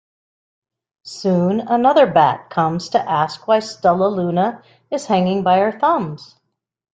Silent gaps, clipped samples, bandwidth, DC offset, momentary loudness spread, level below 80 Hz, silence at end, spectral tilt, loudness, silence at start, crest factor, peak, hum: none; under 0.1%; 9.2 kHz; under 0.1%; 10 LU; -60 dBFS; 0.7 s; -6.5 dB/octave; -17 LUFS; 1.05 s; 16 dB; -2 dBFS; none